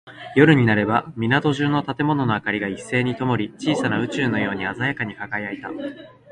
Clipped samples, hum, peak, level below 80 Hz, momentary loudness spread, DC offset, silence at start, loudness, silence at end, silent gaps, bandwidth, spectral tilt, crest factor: under 0.1%; none; 0 dBFS; -54 dBFS; 11 LU; under 0.1%; 0.05 s; -21 LUFS; 0.25 s; none; 10.5 kHz; -6.5 dB/octave; 20 dB